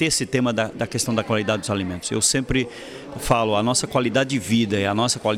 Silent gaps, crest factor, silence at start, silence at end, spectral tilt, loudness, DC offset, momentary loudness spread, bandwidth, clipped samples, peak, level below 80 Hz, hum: none; 16 dB; 0 s; 0 s; -4 dB/octave; -21 LUFS; under 0.1%; 6 LU; 16.5 kHz; under 0.1%; -6 dBFS; -44 dBFS; none